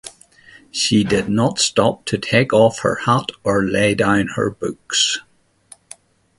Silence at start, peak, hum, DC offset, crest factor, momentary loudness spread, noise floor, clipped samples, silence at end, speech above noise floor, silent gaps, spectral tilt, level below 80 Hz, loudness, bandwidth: 0.05 s; 0 dBFS; none; under 0.1%; 18 dB; 8 LU; -49 dBFS; under 0.1%; 1.2 s; 31 dB; none; -4 dB/octave; -48 dBFS; -17 LUFS; 11.5 kHz